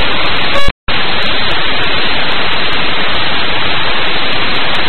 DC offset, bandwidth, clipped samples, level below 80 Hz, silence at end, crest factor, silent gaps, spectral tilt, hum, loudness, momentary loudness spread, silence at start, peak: 40%; 13 kHz; 0.6%; -28 dBFS; 0 s; 14 dB; 0.71-0.87 s; -4.5 dB/octave; none; -13 LUFS; 1 LU; 0 s; 0 dBFS